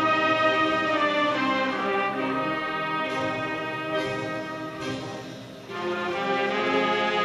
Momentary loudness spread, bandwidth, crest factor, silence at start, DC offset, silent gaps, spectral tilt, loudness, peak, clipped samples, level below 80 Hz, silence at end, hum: 11 LU; 13.5 kHz; 16 dB; 0 s; under 0.1%; none; -5 dB/octave; -25 LUFS; -10 dBFS; under 0.1%; -62 dBFS; 0 s; none